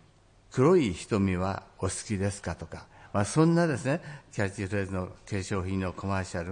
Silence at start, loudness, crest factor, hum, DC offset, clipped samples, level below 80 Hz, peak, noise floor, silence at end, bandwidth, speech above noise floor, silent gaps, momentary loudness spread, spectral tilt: 0.5 s; -29 LUFS; 18 dB; none; under 0.1%; under 0.1%; -58 dBFS; -10 dBFS; -59 dBFS; 0 s; 10.5 kHz; 31 dB; none; 13 LU; -6 dB/octave